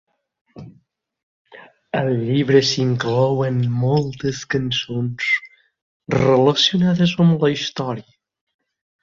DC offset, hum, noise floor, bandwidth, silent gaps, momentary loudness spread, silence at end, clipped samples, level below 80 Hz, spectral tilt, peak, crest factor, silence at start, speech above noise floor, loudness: under 0.1%; none; -59 dBFS; 7.6 kHz; 1.23-1.45 s, 5.82-6.00 s; 10 LU; 1 s; under 0.1%; -54 dBFS; -6 dB/octave; -2 dBFS; 18 dB; 0.55 s; 41 dB; -18 LUFS